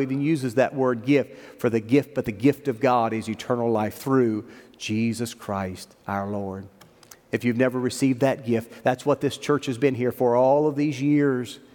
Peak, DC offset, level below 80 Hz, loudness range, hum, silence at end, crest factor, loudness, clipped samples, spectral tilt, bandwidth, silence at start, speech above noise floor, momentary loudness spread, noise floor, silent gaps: -6 dBFS; under 0.1%; -66 dBFS; 5 LU; none; 0.15 s; 18 dB; -24 LUFS; under 0.1%; -6.5 dB/octave; 18.5 kHz; 0 s; 28 dB; 9 LU; -51 dBFS; none